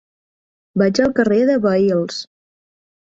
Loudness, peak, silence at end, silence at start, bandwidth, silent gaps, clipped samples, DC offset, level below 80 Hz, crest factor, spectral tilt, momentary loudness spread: -17 LUFS; -2 dBFS; 0.8 s; 0.75 s; 7.8 kHz; none; under 0.1%; under 0.1%; -54 dBFS; 16 dB; -6 dB/octave; 11 LU